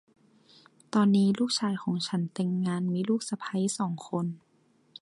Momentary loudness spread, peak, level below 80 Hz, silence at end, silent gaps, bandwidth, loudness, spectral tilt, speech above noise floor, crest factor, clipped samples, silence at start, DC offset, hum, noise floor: 9 LU; -12 dBFS; -74 dBFS; 0.65 s; none; 11.5 kHz; -29 LUFS; -5.5 dB/octave; 38 dB; 16 dB; under 0.1%; 0.95 s; under 0.1%; none; -66 dBFS